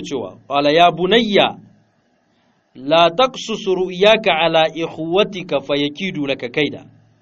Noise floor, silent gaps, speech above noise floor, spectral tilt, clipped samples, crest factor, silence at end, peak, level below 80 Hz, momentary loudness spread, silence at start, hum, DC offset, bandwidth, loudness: -61 dBFS; none; 44 dB; -5 dB/octave; under 0.1%; 18 dB; 0.4 s; 0 dBFS; -54 dBFS; 10 LU; 0 s; none; under 0.1%; 7.8 kHz; -16 LUFS